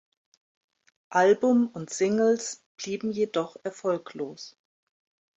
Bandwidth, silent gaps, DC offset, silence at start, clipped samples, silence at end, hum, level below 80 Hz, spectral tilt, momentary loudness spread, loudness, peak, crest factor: 8.4 kHz; 2.66-2.75 s; under 0.1%; 1.1 s; under 0.1%; 0.9 s; none; -74 dBFS; -4.5 dB/octave; 15 LU; -26 LUFS; -10 dBFS; 18 dB